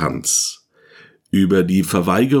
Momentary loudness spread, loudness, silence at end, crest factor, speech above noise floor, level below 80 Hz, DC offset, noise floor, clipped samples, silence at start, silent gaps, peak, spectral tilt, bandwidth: 5 LU; -17 LUFS; 0 s; 16 dB; 32 dB; -50 dBFS; under 0.1%; -48 dBFS; under 0.1%; 0 s; none; -2 dBFS; -4.5 dB/octave; 19 kHz